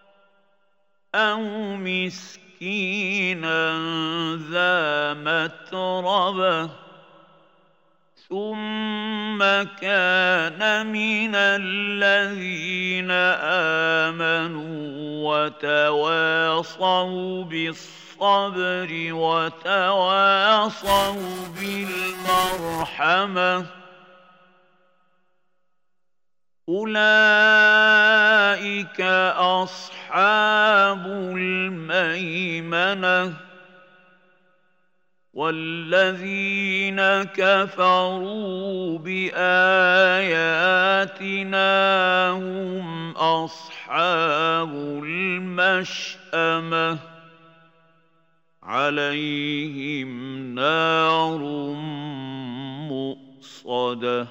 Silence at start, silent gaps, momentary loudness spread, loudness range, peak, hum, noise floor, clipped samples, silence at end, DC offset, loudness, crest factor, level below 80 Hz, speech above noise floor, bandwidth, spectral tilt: 1.15 s; none; 13 LU; 9 LU; -4 dBFS; none; -87 dBFS; under 0.1%; 0 s; under 0.1%; -21 LUFS; 18 dB; -62 dBFS; 65 dB; 16 kHz; -4 dB/octave